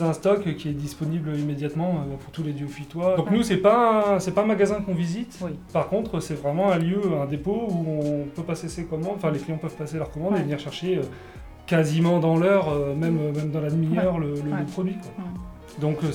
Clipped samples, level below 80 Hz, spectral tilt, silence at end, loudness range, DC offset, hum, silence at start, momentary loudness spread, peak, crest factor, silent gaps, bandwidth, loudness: under 0.1%; -50 dBFS; -7 dB/octave; 0 s; 5 LU; under 0.1%; none; 0 s; 11 LU; -6 dBFS; 18 dB; none; 14.5 kHz; -25 LUFS